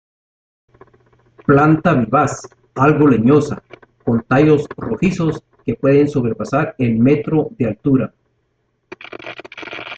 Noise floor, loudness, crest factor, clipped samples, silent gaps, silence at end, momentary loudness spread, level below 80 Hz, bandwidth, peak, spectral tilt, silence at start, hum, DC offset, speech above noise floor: -66 dBFS; -16 LUFS; 16 dB; under 0.1%; none; 0 s; 18 LU; -46 dBFS; 8.6 kHz; 0 dBFS; -8 dB/octave; 1.5 s; none; under 0.1%; 51 dB